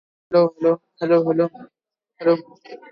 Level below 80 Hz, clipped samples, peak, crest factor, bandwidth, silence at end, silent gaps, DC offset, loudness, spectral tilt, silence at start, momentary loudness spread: -68 dBFS; under 0.1%; -4 dBFS; 16 dB; 5.6 kHz; 0.15 s; none; under 0.1%; -20 LUFS; -9 dB/octave; 0.3 s; 6 LU